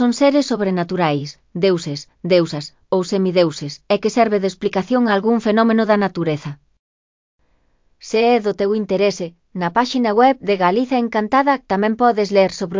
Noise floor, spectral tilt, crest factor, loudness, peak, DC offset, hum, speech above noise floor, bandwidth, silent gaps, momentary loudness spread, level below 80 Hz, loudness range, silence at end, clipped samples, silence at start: -60 dBFS; -6 dB/octave; 16 dB; -17 LUFS; -2 dBFS; under 0.1%; none; 42 dB; 7.6 kHz; 6.79-7.39 s; 9 LU; -58 dBFS; 4 LU; 0 s; under 0.1%; 0 s